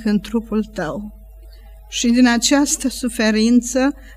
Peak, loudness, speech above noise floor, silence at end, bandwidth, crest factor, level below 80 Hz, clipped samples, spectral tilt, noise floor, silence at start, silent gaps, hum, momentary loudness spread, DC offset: -4 dBFS; -17 LUFS; 22 dB; 0 s; 15.5 kHz; 14 dB; -40 dBFS; under 0.1%; -3.5 dB/octave; -39 dBFS; 0 s; none; none; 13 LU; under 0.1%